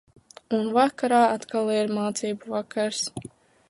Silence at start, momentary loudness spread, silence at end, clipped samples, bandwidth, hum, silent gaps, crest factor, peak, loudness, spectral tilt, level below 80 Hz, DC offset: 0.5 s; 10 LU; 0.4 s; under 0.1%; 11.5 kHz; none; none; 18 dB; -6 dBFS; -25 LUFS; -4 dB/octave; -68 dBFS; under 0.1%